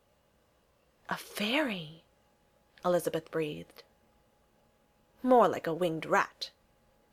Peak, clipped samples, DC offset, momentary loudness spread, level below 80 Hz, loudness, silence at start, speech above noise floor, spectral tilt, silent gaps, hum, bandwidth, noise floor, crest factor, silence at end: -10 dBFS; under 0.1%; under 0.1%; 18 LU; -72 dBFS; -31 LUFS; 1.1 s; 39 dB; -5 dB/octave; none; none; 16 kHz; -69 dBFS; 22 dB; 0.65 s